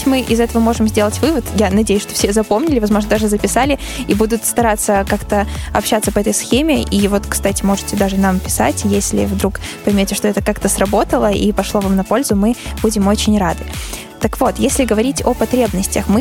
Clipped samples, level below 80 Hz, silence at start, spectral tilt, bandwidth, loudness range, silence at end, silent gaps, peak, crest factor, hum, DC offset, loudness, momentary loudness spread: under 0.1%; -28 dBFS; 0 s; -4.5 dB/octave; 17 kHz; 1 LU; 0 s; none; -2 dBFS; 14 dB; none; under 0.1%; -15 LUFS; 4 LU